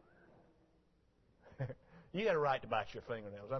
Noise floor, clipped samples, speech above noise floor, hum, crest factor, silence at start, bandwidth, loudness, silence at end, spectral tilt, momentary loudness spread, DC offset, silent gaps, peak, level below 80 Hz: -73 dBFS; under 0.1%; 35 dB; none; 20 dB; 1.45 s; 6.2 kHz; -39 LUFS; 0 s; -4 dB/octave; 12 LU; under 0.1%; none; -22 dBFS; -68 dBFS